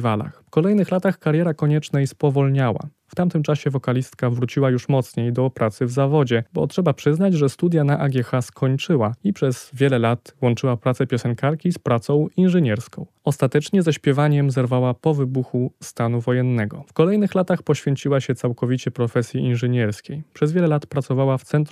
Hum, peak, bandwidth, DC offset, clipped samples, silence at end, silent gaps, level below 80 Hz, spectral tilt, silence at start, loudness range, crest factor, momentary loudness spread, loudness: none; -4 dBFS; 13 kHz; under 0.1%; under 0.1%; 0.05 s; none; -64 dBFS; -7.5 dB/octave; 0 s; 2 LU; 16 dB; 6 LU; -20 LUFS